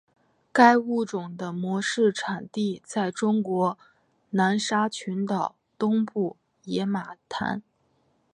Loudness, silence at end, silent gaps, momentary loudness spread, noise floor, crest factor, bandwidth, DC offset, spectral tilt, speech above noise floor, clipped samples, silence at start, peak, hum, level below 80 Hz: -26 LUFS; 0.75 s; none; 11 LU; -68 dBFS; 24 dB; 10.5 kHz; under 0.1%; -5.5 dB/octave; 43 dB; under 0.1%; 0.55 s; -2 dBFS; none; -72 dBFS